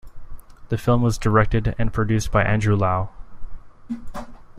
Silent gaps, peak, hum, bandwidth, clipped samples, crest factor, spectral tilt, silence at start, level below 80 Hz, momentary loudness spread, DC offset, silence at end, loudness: none; -4 dBFS; none; 14.5 kHz; under 0.1%; 18 dB; -7 dB/octave; 0.05 s; -32 dBFS; 16 LU; under 0.1%; 0 s; -21 LUFS